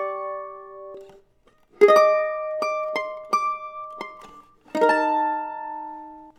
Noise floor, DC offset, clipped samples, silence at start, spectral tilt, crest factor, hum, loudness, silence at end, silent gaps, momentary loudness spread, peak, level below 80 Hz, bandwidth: -60 dBFS; under 0.1%; under 0.1%; 0 s; -3.5 dB/octave; 22 dB; none; -22 LUFS; 0.1 s; none; 23 LU; -2 dBFS; -68 dBFS; 14 kHz